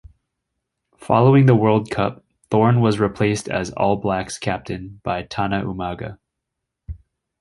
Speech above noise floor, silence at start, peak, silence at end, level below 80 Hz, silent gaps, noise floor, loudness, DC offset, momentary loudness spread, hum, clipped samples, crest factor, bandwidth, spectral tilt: 62 dB; 1 s; -2 dBFS; 0.45 s; -46 dBFS; none; -81 dBFS; -19 LUFS; under 0.1%; 18 LU; none; under 0.1%; 18 dB; 11.5 kHz; -7 dB/octave